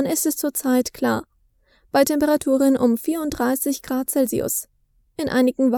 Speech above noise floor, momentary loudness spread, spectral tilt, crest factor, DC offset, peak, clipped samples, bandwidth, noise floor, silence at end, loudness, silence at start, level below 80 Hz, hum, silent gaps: 41 dB; 7 LU; -4 dB/octave; 18 dB; under 0.1%; -4 dBFS; under 0.1%; over 20 kHz; -61 dBFS; 0 s; -21 LUFS; 0 s; -52 dBFS; none; none